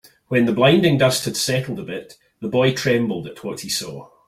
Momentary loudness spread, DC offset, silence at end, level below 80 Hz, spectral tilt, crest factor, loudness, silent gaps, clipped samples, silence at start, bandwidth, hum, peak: 16 LU; under 0.1%; 0.25 s; -56 dBFS; -4.5 dB/octave; 18 dB; -19 LUFS; none; under 0.1%; 0.3 s; 16 kHz; none; -2 dBFS